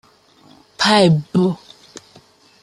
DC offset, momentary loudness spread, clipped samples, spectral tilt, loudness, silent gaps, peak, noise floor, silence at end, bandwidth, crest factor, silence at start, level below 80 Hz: under 0.1%; 8 LU; under 0.1%; -5.5 dB/octave; -15 LUFS; none; -2 dBFS; -50 dBFS; 1.1 s; 12 kHz; 18 dB; 0.8 s; -58 dBFS